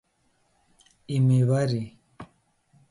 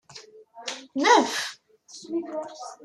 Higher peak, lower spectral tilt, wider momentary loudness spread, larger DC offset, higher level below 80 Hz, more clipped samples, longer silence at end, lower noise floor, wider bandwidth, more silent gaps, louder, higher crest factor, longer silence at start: second, -12 dBFS vs -4 dBFS; first, -8 dB/octave vs -1.5 dB/octave; about the same, 27 LU vs 26 LU; neither; first, -62 dBFS vs -78 dBFS; neither; first, 0.65 s vs 0.1 s; first, -69 dBFS vs -49 dBFS; second, 11.5 kHz vs 13.5 kHz; neither; about the same, -24 LUFS vs -25 LUFS; second, 14 dB vs 22 dB; first, 1.1 s vs 0.15 s